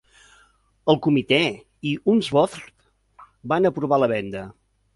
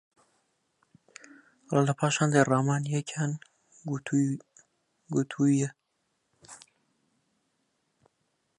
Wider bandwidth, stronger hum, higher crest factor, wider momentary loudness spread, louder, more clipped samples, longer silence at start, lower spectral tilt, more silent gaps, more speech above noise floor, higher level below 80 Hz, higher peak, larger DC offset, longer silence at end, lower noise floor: about the same, 11.5 kHz vs 10.5 kHz; neither; about the same, 20 dB vs 24 dB; second, 15 LU vs 24 LU; first, -21 LUFS vs -28 LUFS; neither; second, 0.85 s vs 1.7 s; about the same, -6 dB/octave vs -6 dB/octave; neither; second, 38 dB vs 51 dB; first, -58 dBFS vs -74 dBFS; first, -4 dBFS vs -8 dBFS; neither; second, 0.45 s vs 2 s; second, -59 dBFS vs -77 dBFS